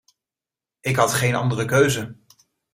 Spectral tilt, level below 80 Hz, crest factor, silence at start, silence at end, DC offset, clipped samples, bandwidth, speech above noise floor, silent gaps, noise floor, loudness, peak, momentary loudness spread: -4.5 dB/octave; -56 dBFS; 20 dB; 0.85 s; 0.6 s; under 0.1%; under 0.1%; 16 kHz; 70 dB; none; -90 dBFS; -20 LUFS; -4 dBFS; 10 LU